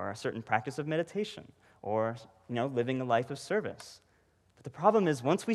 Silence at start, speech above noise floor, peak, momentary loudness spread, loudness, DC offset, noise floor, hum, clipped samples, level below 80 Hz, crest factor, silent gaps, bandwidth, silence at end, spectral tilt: 0 s; 37 dB; -12 dBFS; 20 LU; -32 LUFS; under 0.1%; -69 dBFS; none; under 0.1%; -74 dBFS; 22 dB; none; 13 kHz; 0 s; -6 dB/octave